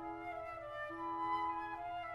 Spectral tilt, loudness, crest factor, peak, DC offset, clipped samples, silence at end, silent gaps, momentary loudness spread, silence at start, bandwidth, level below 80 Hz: -6 dB/octave; -42 LUFS; 14 dB; -28 dBFS; under 0.1%; under 0.1%; 0 s; none; 7 LU; 0 s; 12.5 kHz; -68 dBFS